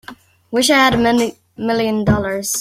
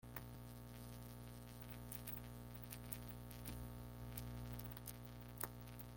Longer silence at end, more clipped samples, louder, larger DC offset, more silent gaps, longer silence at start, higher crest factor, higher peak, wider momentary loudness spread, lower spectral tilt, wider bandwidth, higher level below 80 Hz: about the same, 0 s vs 0 s; neither; first, -16 LUFS vs -52 LUFS; neither; neither; about the same, 0.1 s vs 0 s; second, 16 dB vs 26 dB; first, 0 dBFS vs -26 dBFS; first, 11 LU vs 6 LU; about the same, -4 dB/octave vs -5 dB/octave; about the same, 16.5 kHz vs 17 kHz; first, -40 dBFS vs -60 dBFS